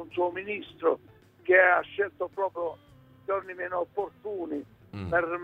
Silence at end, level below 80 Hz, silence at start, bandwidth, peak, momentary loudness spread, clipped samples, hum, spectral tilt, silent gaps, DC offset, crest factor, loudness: 0 s; -62 dBFS; 0 s; 4.9 kHz; -10 dBFS; 16 LU; under 0.1%; none; -7.5 dB/octave; none; under 0.1%; 20 dB; -28 LUFS